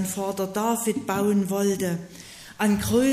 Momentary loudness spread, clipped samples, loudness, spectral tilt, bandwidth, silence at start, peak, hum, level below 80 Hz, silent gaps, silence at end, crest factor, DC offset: 14 LU; under 0.1%; -25 LUFS; -5 dB/octave; 15.5 kHz; 0 s; -10 dBFS; none; -52 dBFS; none; 0 s; 14 dB; under 0.1%